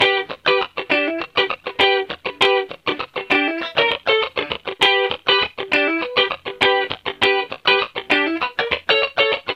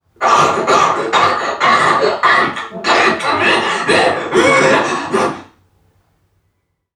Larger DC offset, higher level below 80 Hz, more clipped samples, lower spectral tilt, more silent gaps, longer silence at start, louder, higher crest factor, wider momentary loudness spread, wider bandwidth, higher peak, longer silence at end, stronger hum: neither; about the same, -56 dBFS vs -56 dBFS; neither; about the same, -3.5 dB/octave vs -3 dB/octave; neither; second, 0 s vs 0.2 s; second, -18 LUFS vs -13 LUFS; about the same, 18 dB vs 14 dB; about the same, 6 LU vs 6 LU; second, 12 kHz vs 13.5 kHz; about the same, -2 dBFS vs 0 dBFS; second, 0 s vs 1.5 s; neither